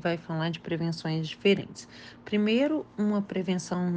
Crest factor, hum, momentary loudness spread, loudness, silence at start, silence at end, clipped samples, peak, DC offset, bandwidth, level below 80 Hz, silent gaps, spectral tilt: 16 dB; none; 12 LU; -29 LUFS; 0.05 s; 0 s; under 0.1%; -12 dBFS; under 0.1%; 9.2 kHz; -66 dBFS; none; -6 dB/octave